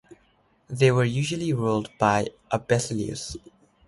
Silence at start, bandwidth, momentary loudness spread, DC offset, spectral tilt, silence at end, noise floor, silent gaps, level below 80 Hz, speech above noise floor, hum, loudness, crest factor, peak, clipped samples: 0.1 s; 11.5 kHz; 14 LU; under 0.1%; -5.5 dB/octave; 0.5 s; -64 dBFS; none; -54 dBFS; 39 dB; none; -25 LUFS; 20 dB; -6 dBFS; under 0.1%